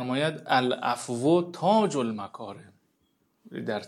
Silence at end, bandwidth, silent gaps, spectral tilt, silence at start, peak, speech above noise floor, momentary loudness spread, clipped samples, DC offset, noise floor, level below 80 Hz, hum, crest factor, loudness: 0 s; 13 kHz; none; -5.5 dB/octave; 0 s; -8 dBFS; 45 dB; 16 LU; under 0.1%; under 0.1%; -71 dBFS; -82 dBFS; none; 20 dB; -26 LUFS